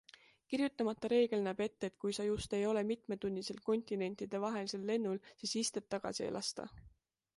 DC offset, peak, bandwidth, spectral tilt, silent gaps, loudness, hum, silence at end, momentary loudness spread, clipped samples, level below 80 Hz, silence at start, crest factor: under 0.1%; -20 dBFS; 11.5 kHz; -4.5 dB/octave; none; -38 LUFS; none; 0.5 s; 7 LU; under 0.1%; -66 dBFS; 0.5 s; 18 dB